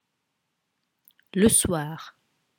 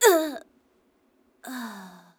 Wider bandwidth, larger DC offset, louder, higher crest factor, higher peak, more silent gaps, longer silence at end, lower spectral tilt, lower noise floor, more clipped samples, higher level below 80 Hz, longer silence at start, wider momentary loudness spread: about the same, 19 kHz vs over 20 kHz; neither; first, -22 LUFS vs -27 LUFS; about the same, 22 dB vs 22 dB; about the same, -6 dBFS vs -4 dBFS; neither; first, 0.5 s vs 0.3 s; first, -4 dB/octave vs -1.5 dB/octave; first, -78 dBFS vs -66 dBFS; neither; first, -50 dBFS vs -76 dBFS; first, 1.35 s vs 0 s; second, 17 LU vs 22 LU